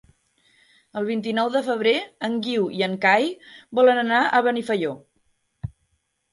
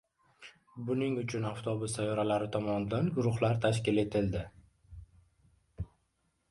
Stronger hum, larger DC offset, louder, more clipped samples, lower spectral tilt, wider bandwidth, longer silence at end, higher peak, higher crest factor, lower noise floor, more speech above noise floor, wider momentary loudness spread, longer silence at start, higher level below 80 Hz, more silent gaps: neither; neither; first, -22 LUFS vs -32 LUFS; neither; about the same, -5.5 dB/octave vs -6.5 dB/octave; about the same, 11.5 kHz vs 11.5 kHz; about the same, 0.65 s vs 0.65 s; first, -4 dBFS vs -16 dBFS; about the same, 18 dB vs 18 dB; second, -71 dBFS vs -77 dBFS; first, 49 dB vs 45 dB; first, 20 LU vs 17 LU; first, 0.95 s vs 0.4 s; about the same, -60 dBFS vs -56 dBFS; neither